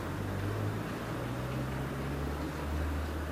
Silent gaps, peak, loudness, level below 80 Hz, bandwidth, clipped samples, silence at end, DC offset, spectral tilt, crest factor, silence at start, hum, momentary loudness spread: none; -22 dBFS; -36 LUFS; -44 dBFS; 16 kHz; under 0.1%; 0 s; under 0.1%; -6.5 dB/octave; 12 dB; 0 s; none; 2 LU